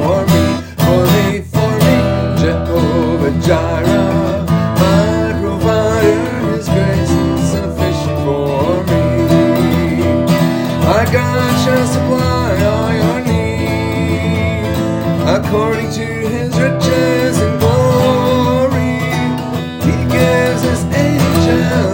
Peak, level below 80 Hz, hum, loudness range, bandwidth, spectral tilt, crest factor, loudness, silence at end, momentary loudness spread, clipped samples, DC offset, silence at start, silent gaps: 0 dBFS; -34 dBFS; none; 2 LU; 17 kHz; -6.5 dB/octave; 12 dB; -13 LUFS; 0 s; 5 LU; under 0.1%; under 0.1%; 0 s; none